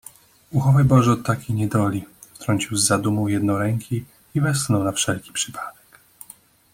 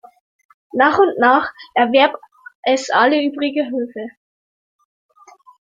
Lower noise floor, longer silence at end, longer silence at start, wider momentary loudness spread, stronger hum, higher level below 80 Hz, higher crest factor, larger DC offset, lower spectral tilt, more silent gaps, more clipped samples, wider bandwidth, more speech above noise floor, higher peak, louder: about the same, -49 dBFS vs -47 dBFS; second, 1 s vs 1.6 s; second, 0.5 s vs 0.75 s; about the same, 15 LU vs 14 LU; neither; first, -52 dBFS vs -64 dBFS; about the same, 20 dB vs 18 dB; neither; first, -5 dB/octave vs -3.5 dB/octave; second, none vs 2.55-2.63 s; neither; first, 16.5 kHz vs 7.6 kHz; about the same, 29 dB vs 32 dB; about the same, -2 dBFS vs -2 dBFS; second, -21 LUFS vs -16 LUFS